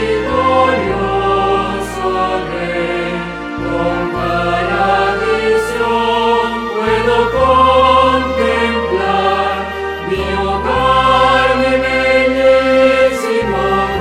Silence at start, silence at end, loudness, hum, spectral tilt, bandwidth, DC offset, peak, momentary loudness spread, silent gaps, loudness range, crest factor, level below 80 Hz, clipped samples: 0 s; 0 s; -13 LUFS; none; -5 dB/octave; 13.5 kHz; under 0.1%; 0 dBFS; 9 LU; none; 5 LU; 12 dB; -32 dBFS; under 0.1%